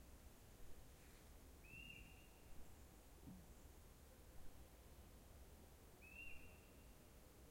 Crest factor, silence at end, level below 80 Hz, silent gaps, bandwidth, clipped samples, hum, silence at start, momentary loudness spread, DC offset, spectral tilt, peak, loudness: 16 dB; 0 s; -66 dBFS; none; 16.5 kHz; under 0.1%; none; 0 s; 8 LU; under 0.1%; -4 dB/octave; -44 dBFS; -63 LUFS